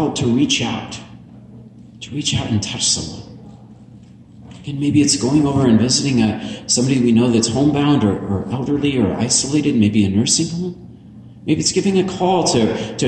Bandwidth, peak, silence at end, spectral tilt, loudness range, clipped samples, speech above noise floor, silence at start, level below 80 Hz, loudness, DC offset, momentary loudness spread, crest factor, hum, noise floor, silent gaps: 11.5 kHz; -2 dBFS; 0 s; -4.5 dB/octave; 7 LU; under 0.1%; 25 dB; 0 s; -46 dBFS; -16 LUFS; under 0.1%; 13 LU; 14 dB; none; -42 dBFS; none